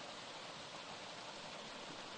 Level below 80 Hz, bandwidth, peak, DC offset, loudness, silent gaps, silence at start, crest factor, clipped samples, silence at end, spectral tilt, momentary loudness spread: -80 dBFS; 11 kHz; -38 dBFS; under 0.1%; -49 LUFS; none; 0 s; 12 dB; under 0.1%; 0 s; -2 dB/octave; 0 LU